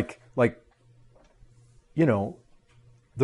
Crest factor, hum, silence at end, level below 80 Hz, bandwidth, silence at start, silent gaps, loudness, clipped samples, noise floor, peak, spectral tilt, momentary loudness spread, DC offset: 22 dB; none; 0 s; -60 dBFS; 11.5 kHz; 0 s; none; -27 LUFS; under 0.1%; -58 dBFS; -8 dBFS; -8.5 dB/octave; 12 LU; under 0.1%